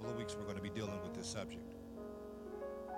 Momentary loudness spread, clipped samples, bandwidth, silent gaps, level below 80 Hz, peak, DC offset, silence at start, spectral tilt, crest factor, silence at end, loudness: 7 LU; under 0.1%; 17 kHz; none; -64 dBFS; -28 dBFS; under 0.1%; 0 s; -5 dB/octave; 16 dB; 0 s; -46 LUFS